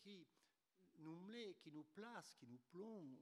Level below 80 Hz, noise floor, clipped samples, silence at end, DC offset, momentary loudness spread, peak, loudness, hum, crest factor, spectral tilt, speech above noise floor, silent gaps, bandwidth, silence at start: under -90 dBFS; -85 dBFS; under 0.1%; 0 s; under 0.1%; 8 LU; -40 dBFS; -59 LUFS; none; 18 dB; -5 dB/octave; 27 dB; none; 12 kHz; 0 s